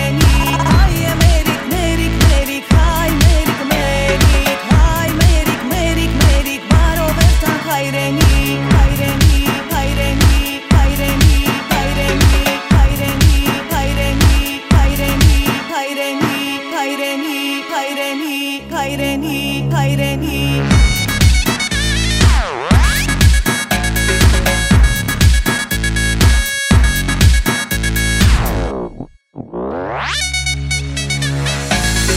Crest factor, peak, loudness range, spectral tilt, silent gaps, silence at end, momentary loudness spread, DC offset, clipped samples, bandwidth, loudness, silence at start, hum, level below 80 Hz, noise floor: 12 dB; 0 dBFS; 5 LU; -4.5 dB/octave; none; 0 s; 7 LU; under 0.1%; under 0.1%; 16.5 kHz; -14 LUFS; 0 s; none; -16 dBFS; -33 dBFS